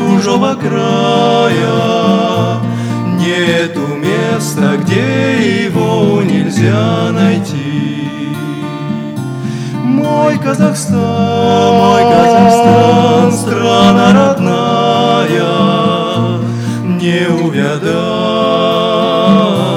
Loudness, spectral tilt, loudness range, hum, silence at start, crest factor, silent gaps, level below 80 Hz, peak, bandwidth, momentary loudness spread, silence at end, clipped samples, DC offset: -11 LUFS; -6 dB/octave; 6 LU; none; 0 s; 10 dB; none; -48 dBFS; 0 dBFS; 14.5 kHz; 9 LU; 0 s; 0.3%; under 0.1%